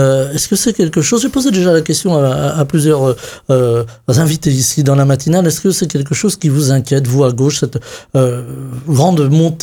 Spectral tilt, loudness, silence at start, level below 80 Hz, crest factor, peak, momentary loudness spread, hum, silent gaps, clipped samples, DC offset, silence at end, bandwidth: -5.5 dB/octave; -13 LUFS; 0 s; -44 dBFS; 12 dB; 0 dBFS; 5 LU; none; none; under 0.1%; under 0.1%; 0 s; 18.5 kHz